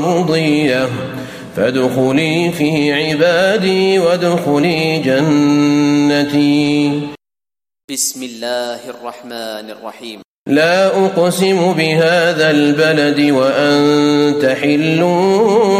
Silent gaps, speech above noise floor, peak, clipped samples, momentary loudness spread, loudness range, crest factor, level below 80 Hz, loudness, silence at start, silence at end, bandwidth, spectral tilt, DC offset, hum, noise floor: 7.84-7.88 s, 10.25-10.45 s; over 77 dB; -2 dBFS; under 0.1%; 14 LU; 7 LU; 12 dB; -56 dBFS; -13 LUFS; 0 s; 0 s; 15.5 kHz; -5 dB/octave; under 0.1%; none; under -90 dBFS